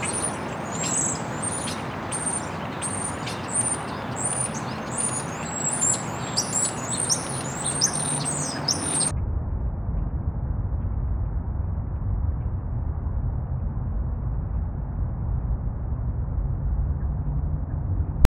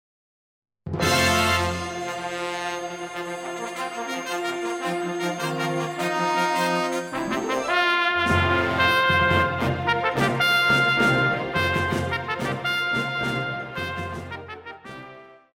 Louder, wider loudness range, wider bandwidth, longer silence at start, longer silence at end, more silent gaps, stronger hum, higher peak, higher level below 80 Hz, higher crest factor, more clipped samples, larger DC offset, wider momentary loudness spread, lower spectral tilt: second, -26 LUFS vs -23 LUFS; about the same, 6 LU vs 8 LU; first, 18.5 kHz vs 16.5 kHz; second, 0 s vs 0.85 s; about the same, 0.1 s vs 0.2 s; neither; neither; first, -2 dBFS vs -8 dBFS; first, -32 dBFS vs -48 dBFS; first, 24 dB vs 18 dB; neither; neither; second, 8 LU vs 13 LU; about the same, -3.5 dB/octave vs -4 dB/octave